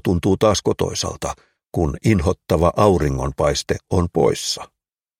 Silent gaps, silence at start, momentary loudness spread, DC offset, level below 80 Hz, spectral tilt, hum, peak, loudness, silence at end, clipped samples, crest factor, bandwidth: none; 0.05 s; 10 LU; under 0.1%; -34 dBFS; -5.5 dB/octave; none; 0 dBFS; -19 LUFS; 0.55 s; under 0.1%; 18 dB; 16.5 kHz